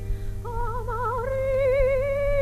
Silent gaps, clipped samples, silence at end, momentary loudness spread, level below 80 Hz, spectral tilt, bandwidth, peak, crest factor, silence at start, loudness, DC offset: none; under 0.1%; 0 s; 12 LU; -30 dBFS; -7 dB/octave; 14 kHz; -10 dBFS; 14 dB; 0 s; -26 LUFS; under 0.1%